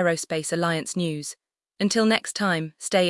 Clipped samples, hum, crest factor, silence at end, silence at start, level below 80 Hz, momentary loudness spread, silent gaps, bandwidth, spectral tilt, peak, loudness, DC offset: under 0.1%; none; 18 dB; 0 s; 0 s; -68 dBFS; 10 LU; none; 12 kHz; -4 dB/octave; -6 dBFS; -25 LUFS; under 0.1%